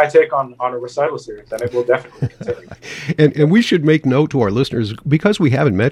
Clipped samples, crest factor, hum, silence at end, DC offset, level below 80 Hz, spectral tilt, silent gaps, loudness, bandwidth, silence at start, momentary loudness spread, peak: under 0.1%; 16 dB; none; 0 s; under 0.1%; -50 dBFS; -7 dB/octave; none; -16 LUFS; 12 kHz; 0 s; 14 LU; 0 dBFS